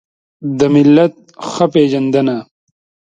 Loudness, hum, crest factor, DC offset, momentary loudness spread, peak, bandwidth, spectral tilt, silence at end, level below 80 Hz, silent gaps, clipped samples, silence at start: -12 LUFS; none; 14 dB; under 0.1%; 16 LU; 0 dBFS; 7.8 kHz; -7 dB/octave; 0.65 s; -56 dBFS; none; under 0.1%; 0.4 s